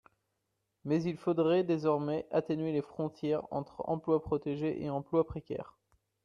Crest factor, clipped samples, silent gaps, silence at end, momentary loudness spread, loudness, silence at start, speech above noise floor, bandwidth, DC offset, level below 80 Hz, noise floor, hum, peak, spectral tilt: 18 dB; under 0.1%; none; 0.55 s; 11 LU; -33 LUFS; 0.85 s; 50 dB; 7 kHz; under 0.1%; -64 dBFS; -83 dBFS; none; -16 dBFS; -8.5 dB/octave